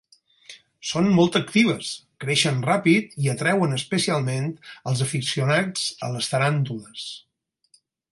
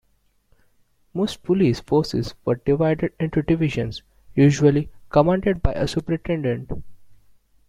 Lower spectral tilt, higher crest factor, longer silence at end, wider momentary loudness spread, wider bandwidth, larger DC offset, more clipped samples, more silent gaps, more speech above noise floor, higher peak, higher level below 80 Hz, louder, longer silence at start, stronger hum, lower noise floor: second, -5 dB/octave vs -7 dB/octave; about the same, 18 dB vs 20 dB; first, 0.95 s vs 0.55 s; about the same, 13 LU vs 11 LU; about the same, 11.5 kHz vs 12 kHz; neither; neither; neither; about the same, 40 dB vs 43 dB; second, -6 dBFS vs -2 dBFS; second, -64 dBFS vs -38 dBFS; about the same, -22 LUFS vs -21 LUFS; second, 0.5 s vs 1.15 s; neither; about the same, -63 dBFS vs -64 dBFS